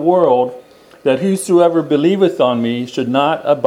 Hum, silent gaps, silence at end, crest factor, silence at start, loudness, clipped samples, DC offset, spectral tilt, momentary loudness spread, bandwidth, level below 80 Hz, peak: none; none; 0 s; 14 dB; 0 s; -15 LUFS; under 0.1%; under 0.1%; -6 dB/octave; 7 LU; 14.5 kHz; -64 dBFS; 0 dBFS